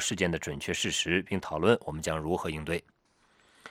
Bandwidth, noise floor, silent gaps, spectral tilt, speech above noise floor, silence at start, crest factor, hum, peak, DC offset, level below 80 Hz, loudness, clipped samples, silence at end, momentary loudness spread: 17 kHz; -67 dBFS; none; -4 dB/octave; 36 dB; 0 s; 24 dB; none; -8 dBFS; under 0.1%; -52 dBFS; -30 LUFS; under 0.1%; 0 s; 7 LU